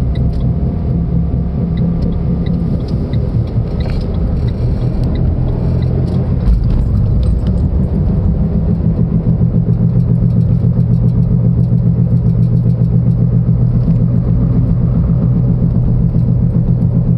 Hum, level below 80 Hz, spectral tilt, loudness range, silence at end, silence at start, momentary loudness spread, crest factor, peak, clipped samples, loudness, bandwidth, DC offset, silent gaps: none; -18 dBFS; -11.5 dB/octave; 4 LU; 0 s; 0 s; 4 LU; 10 dB; -2 dBFS; under 0.1%; -14 LUFS; 5.2 kHz; under 0.1%; none